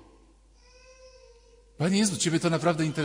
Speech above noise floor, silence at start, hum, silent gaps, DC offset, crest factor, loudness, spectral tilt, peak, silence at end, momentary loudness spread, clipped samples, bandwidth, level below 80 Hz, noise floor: 32 dB; 1.05 s; none; none; under 0.1%; 18 dB; -26 LUFS; -4.5 dB/octave; -12 dBFS; 0 s; 3 LU; under 0.1%; 16 kHz; -58 dBFS; -57 dBFS